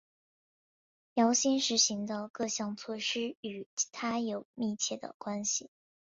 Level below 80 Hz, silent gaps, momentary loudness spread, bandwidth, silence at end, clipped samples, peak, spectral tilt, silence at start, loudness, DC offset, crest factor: -78 dBFS; 2.30-2.34 s, 3.37-3.43 s, 3.66-3.77 s, 4.45-4.54 s, 5.14-5.20 s; 11 LU; 7.8 kHz; 0.45 s; under 0.1%; -14 dBFS; -2 dB/octave; 1.15 s; -32 LUFS; under 0.1%; 22 dB